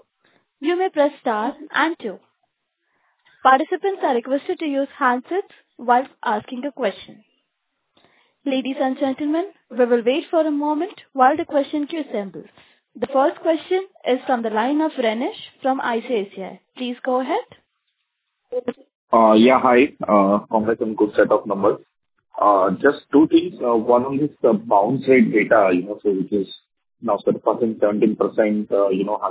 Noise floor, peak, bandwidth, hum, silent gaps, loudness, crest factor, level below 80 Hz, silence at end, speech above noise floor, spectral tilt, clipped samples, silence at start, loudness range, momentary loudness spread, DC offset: -76 dBFS; -2 dBFS; 4 kHz; none; 18.95-19.08 s; -20 LUFS; 18 dB; -64 dBFS; 0 s; 56 dB; -10 dB/octave; under 0.1%; 0.6 s; 8 LU; 12 LU; under 0.1%